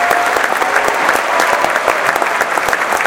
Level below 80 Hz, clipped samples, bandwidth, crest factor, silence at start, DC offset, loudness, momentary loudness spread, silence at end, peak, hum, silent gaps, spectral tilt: -48 dBFS; 0.1%; 17.5 kHz; 14 dB; 0 s; under 0.1%; -13 LUFS; 2 LU; 0 s; 0 dBFS; none; none; -1.5 dB/octave